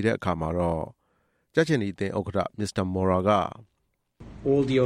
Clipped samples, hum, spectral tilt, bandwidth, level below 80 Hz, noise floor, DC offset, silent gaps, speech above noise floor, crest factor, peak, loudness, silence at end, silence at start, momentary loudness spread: under 0.1%; none; -7 dB/octave; 12 kHz; -52 dBFS; -70 dBFS; under 0.1%; none; 45 dB; 18 dB; -8 dBFS; -26 LUFS; 0 s; 0 s; 8 LU